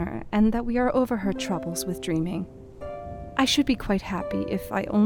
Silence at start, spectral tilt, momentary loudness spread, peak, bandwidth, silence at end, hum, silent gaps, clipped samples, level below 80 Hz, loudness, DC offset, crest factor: 0 s; -5 dB/octave; 14 LU; -8 dBFS; 18.5 kHz; 0 s; none; none; under 0.1%; -42 dBFS; -26 LUFS; under 0.1%; 18 dB